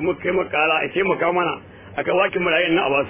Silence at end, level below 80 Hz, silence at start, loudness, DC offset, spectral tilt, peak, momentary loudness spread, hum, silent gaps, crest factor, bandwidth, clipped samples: 0 s; -54 dBFS; 0 s; -20 LUFS; under 0.1%; -8.5 dB/octave; -6 dBFS; 8 LU; none; none; 14 dB; 3.6 kHz; under 0.1%